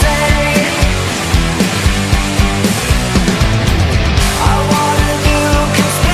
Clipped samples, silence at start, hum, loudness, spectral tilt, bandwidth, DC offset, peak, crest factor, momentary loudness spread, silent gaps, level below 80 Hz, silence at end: under 0.1%; 0 s; none; -12 LUFS; -4.5 dB/octave; 16 kHz; under 0.1%; 0 dBFS; 12 dB; 2 LU; none; -16 dBFS; 0 s